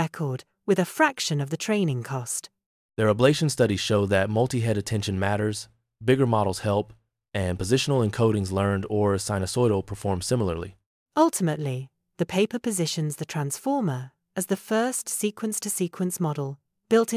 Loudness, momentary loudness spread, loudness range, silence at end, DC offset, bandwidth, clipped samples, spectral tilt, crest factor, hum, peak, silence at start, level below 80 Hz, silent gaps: -25 LUFS; 10 LU; 3 LU; 0 s; under 0.1%; 16 kHz; under 0.1%; -5 dB/octave; 20 dB; none; -6 dBFS; 0 s; -48 dBFS; 2.66-2.89 s, 10.86-11.06 s